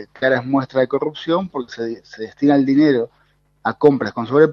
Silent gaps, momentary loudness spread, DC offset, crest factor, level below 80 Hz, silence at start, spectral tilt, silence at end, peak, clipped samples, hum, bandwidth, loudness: none; 13 LU; under 0.1%; 18 dB; -60 dBFS; 0 s; -8 dB/octave; 0 s; 0 dBFS; under 0.1%; none; 6.6 kHz; -18 LUFS